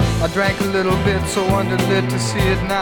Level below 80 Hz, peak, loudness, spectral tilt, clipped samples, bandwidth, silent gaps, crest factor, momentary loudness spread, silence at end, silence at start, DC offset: -30 dBFS; -2 dBFS; -18 LUFS; -5.5 dB/octave; under 0.1%; 20 kHz; none; 14 dB; 1 LU; 0 s; 0 s; under 0.1%